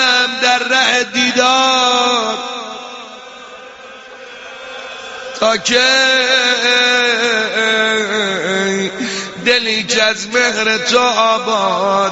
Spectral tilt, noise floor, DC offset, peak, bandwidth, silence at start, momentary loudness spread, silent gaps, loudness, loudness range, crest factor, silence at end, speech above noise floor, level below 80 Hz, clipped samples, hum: -1.5 dB/octave; -35 dBFS; under 0.1%; 0 dBFS; 8.2 kHz; 0 s; 21 LU; none; -13 LUFS; 8 LU; 14 dB; 0 s; 22 dB; -58 dBFS; under 0.1%; none